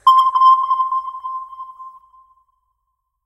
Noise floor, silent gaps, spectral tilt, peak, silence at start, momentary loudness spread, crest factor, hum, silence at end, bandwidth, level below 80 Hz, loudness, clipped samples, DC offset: -73 dBFS; none; 1 dB/octave; -2 dBFS; 0.05 s; 22 LU; 16 dB; none; 1.35 s; 12.5 kHz; -66 dBFS; -14 LUFS; under 0.1%; under 0.1%